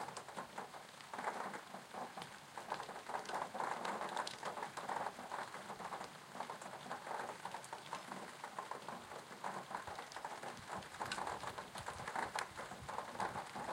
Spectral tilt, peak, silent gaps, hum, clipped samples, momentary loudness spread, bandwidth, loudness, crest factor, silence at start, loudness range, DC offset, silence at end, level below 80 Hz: -3 dB/octave; -22 dBFS; none; none; under 0.1%; 7 LU; 16.5 kHz; -46 LUFS; 24 dB; 0 s; 4 LU; under 0.1%; 0 s; -76 dBFS